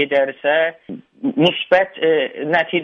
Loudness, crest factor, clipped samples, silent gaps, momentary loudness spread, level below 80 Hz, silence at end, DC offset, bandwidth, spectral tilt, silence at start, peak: -18 LUFS; 16 dB; under 0.1%; none; 9 LU; -64 dBFS; 0 s; under 0.1%; 6.8 kHz; -6.5 dB/octave; 0 s; -2 dBFS